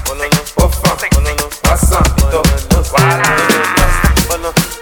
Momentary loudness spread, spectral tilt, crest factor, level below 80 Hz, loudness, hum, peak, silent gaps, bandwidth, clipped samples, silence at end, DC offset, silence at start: 4 LU; -4 dB/octave; 12 dB; -16 dBFS; -12 LUFS; none; 0 dBFS; none; 19.5 kHz; under 0.1%; 0 s; under 0.1%; 0 s